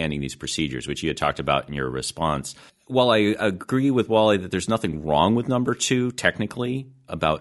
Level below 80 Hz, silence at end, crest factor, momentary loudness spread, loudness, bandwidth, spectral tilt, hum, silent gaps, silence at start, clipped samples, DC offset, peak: -46 dBFS; 0 s; 20 dB; 9 LU; -23 LUFS; 11.5 kHz; -5 dB/octave; none; none; 0 s; under 0.1%; under 0.1%; -2 dBFS